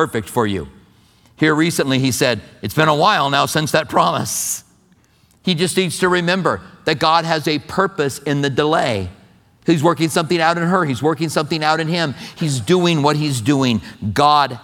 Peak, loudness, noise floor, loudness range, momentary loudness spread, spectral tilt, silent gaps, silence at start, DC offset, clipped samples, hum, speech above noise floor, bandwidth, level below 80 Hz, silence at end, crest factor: 0 dBFS; -17 LUFS; -55 dBFS; 2 LU; 8 LU; -4.5 dB/octave; none; 0 s; under 0.1%; under 0.1%; none; 38 dB; 18.5 kHz; -52 dBFS; 0.05 s; 16 dB